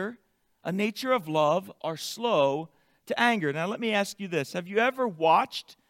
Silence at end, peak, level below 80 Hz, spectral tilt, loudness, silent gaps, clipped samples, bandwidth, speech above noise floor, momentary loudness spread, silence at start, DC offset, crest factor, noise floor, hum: 0.2 s; -10 dBFS; -78 dBFS; -4.5 dB/octave; -27 LUFS; none; under 0.1%; 16.5 kHz; 35 dB; 11 LU; 0 s; under 0.1%; 18 dB; -62 dBFS; none